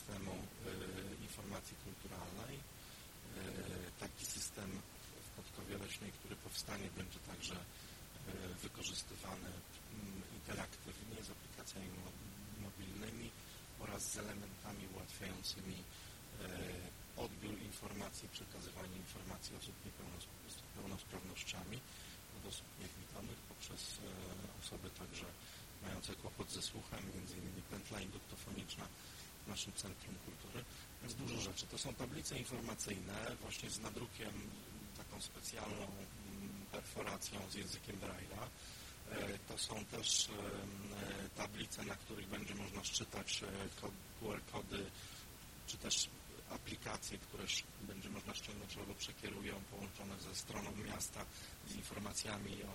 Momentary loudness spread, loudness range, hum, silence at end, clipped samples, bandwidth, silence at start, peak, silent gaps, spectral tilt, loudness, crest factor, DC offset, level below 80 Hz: 9 LU; 7 LU; none; 0 s; under 0.1%; 16.5 kHz; 0 s; -24 dBFS; none; -3 dB/octave; -48 LUFS; 26 dB; under 0.1%; -62 dBFS